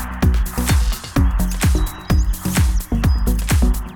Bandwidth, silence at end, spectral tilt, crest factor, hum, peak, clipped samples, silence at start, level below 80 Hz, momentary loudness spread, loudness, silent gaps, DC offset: 19.5 kHz; 0 s; -5.5 dB/octave; 12 dB; none; -4 dBFS; under 0.1%; 0 s; -18 dBFS; 2 LU; -19 LUFS; none; under 0.1%